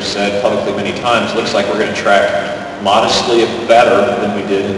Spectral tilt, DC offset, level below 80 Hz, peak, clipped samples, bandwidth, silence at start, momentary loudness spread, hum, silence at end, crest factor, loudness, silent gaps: -4 dB/octave; under 0.1%; -46 dBFS; 0 dBFS; under 0.1%; 11.5 kHz; 0 s; 7 LU; none; 0 s; 12 dB; -13 LUFS; none